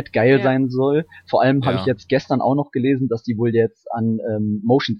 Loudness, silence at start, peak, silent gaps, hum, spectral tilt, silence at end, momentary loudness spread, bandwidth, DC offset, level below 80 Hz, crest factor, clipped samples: -19 LUFS; 0 s; -4 dBFS; none; none; -8 dB/octave; 0 s; 6 LU; 6.6 kHz; under 0.1%; -58 dBFS; 16 dB; under 0.1%